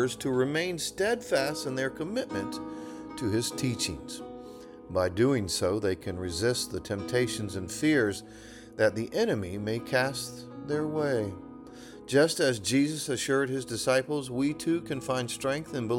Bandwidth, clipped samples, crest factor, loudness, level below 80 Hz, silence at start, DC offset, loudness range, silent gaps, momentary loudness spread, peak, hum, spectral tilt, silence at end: 18 kHz; under 0.1%; 18 dB; -29 LUFS; -58 dBFS; 0 s; under 0.1%; 3 LU; none; 15 LU; -12 dBFS; none; -4.5 dB/octave; 0 s